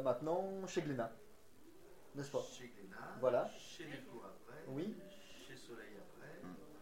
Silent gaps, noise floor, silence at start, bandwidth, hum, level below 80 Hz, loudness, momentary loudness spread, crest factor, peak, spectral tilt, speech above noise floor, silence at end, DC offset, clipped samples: none; -64 dBFS; 0 s; 16 kHz; none; -74 dBFS; -44 LUFS; 22 LU; 22 dB; -22 dBFS; -5.5 dB/octave; 21 dB; 0 s; 0.1%; under 0.1%